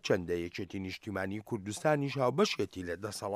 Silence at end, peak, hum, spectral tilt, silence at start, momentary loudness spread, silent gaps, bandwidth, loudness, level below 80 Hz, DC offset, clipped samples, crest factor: 0 s; -14 dBFS; none; -5 dB/octave; 0.05 s; 10 LU; none; 15.5 kHz; -34 LUFS; -66 dBFS; under 0.1%; under 0.1%; 18 dB